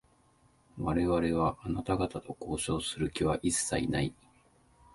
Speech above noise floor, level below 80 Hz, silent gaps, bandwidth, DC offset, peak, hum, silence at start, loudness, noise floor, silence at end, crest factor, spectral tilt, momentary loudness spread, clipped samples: 35 dB; -48 dBFS; none; 11.5 kHz; under 0.1%; -16 dBFS; none; 0.75 s; -32 LUFS; -66 dBFS; 0.8 s; 18 dB; -5 dB/octave; 8 LU; under 0.1%